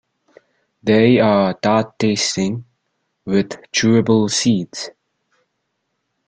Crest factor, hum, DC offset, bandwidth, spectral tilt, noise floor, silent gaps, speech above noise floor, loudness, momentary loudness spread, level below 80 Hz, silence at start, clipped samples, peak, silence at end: 16 dB; none; under 0.1%; 9.4 kHz; -5 dB/octave; -72 dBFS; none; 56 dB; -16 LUFS; 15 LU; -54 dBFS; 0.85 s; under 0.1%; -2 dBFS; 1.4 s